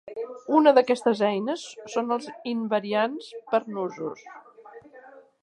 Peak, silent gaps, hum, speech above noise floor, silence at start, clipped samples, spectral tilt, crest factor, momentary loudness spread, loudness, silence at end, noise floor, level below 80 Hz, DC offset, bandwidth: -4 dBFS; none; none; 25 dB; 0.05 s; under 0.1%; -5 dB/octave; 22 dB; 17 LU; -25 LUFS; 0.25 s; -50 dBFS; -80 dBFS; under 0.1%; 11 kHz